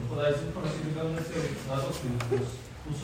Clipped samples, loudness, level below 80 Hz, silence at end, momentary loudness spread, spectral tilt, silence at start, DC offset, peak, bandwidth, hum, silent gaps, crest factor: under 0.1%; -32 LUFS; -50 dBFS; 0 s; 6 LU; -6 dB/octave; 0 s; under 0.1%; -16 dBFS; 16 kHz; none; none; 16 dB